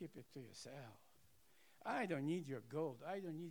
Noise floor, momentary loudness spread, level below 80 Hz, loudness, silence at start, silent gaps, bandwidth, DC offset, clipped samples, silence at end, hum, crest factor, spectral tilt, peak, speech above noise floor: -74 dBFS; 15 LU; -88 dBFS; -47 LUFS; 0 s; none; over 20 kHz; under 0.1%; under 0.1%; 0 s; none; 18 dB; -6 dB/octave; -30 dBFS; 27 dB